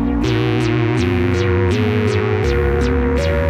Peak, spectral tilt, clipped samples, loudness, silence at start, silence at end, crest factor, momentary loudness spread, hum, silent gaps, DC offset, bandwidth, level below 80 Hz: -4 dBFS; -7 dB/octave; under 0.1%; -17 LUFS; 0 s; 0 s; 12 dB; 1 LU; none; none; under 0.1%; 11 kHz; -26 dBFS